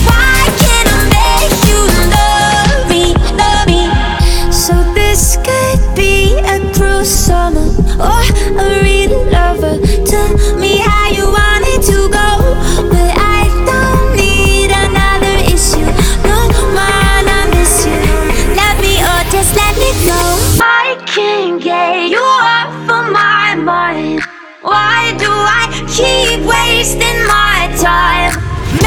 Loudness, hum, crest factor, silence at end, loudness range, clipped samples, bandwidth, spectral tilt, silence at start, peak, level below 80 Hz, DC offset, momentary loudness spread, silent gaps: -10 LUFS; none; 10 dB; 0 s; 1 LU; 0.2%; over 20 kHz; -3.5 dB/octave; 0 s; 0 dBFS; -14 dBFS; under 0.1%; 4 LU; none